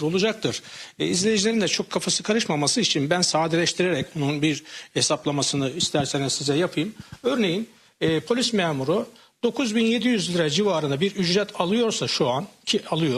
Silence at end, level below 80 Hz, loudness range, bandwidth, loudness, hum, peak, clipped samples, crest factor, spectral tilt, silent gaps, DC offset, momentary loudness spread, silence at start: 0 s; -62 dBFS; 2 LU; 14.5 kHz; -23 LUFS; none; -8 dBFS; under 0.1%; 16 dB; -4 dB/octave; none; under 0.1%; 8 LU; 0 s